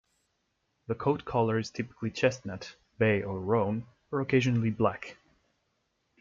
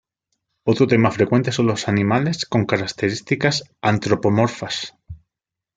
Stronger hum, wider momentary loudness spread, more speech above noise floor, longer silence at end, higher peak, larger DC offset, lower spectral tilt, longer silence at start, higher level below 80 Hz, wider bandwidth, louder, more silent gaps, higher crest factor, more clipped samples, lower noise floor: neither; first, 15 LU vs 8 LU; second, 49 dB vs 66 dB; first, 1.1 s vs 0.6 s; second, -10 dBFS vs -2 dBFS; neither; first, -7 dB/octave vs -5.5 dB/octave; first, 0.9 s vs 0.65 s; second, -62 dBFS vs -54 dBFS; second, 7.6 kHz vs 9.4 kHz; second, -30 LUFS vs -20 LUFS; neither; about the same, 20 dB vs 18 dB; neither; second, -77 dBFS vs -85 dBFS